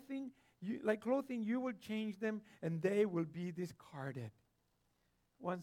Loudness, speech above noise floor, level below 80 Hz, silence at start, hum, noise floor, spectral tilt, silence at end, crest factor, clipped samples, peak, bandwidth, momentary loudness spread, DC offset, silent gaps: -41 LUFS; 40 dB; -84 dBFS; 0 s; none; -80 dBFS; -7.5 dB/octave; 0 s; 20 dB; under 0.1%; -22 dBFS; 16 kHz; 12 LU; under 0.1%; none